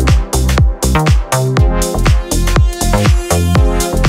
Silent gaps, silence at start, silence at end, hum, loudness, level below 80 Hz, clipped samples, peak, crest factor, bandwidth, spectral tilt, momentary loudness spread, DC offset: none; 0 s; 0 s; none; -13 LUFS; -14 dBFS; under 0.1%; 0 dBFS; 10 dB; 16.5 kHz; -5 dB/octave; 2 LU; under 0.1%